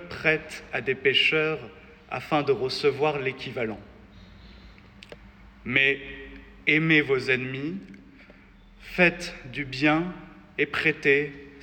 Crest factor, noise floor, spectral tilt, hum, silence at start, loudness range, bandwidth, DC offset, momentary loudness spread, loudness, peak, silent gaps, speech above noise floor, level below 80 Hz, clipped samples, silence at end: 20 dB; -52 dBFS; -5.5 dB/octave; none; 0 s; 4 LU; 17 kHz; under 0.1%; 16 LU; -24 LUFS; -6 dBFS; none; 27 dB; -54 dBFS; under 0.1%; 0 s